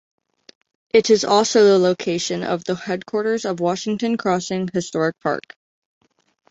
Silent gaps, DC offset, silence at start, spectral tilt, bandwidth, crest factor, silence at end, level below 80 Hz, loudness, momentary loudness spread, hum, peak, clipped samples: none; under 0.1%; 0.95 s; -4.5 dB/octave; 8 kHz; 18 dB; 1.1 s; -62 dBFS; -19 LUFS; 10 LU; none; -2 dBFS; under 0.1%